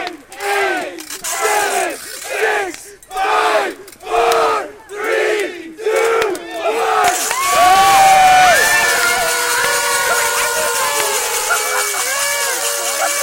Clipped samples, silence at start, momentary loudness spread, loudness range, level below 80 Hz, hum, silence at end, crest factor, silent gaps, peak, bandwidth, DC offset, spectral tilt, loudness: under 0.1%; 0 s; 14 LU; 7 LU; -48 dBFS; none; 0 s; 14 dB; none; -2 dBFS; 17 kHz; under 0.1%; 0 dB/octave; -14 LUFS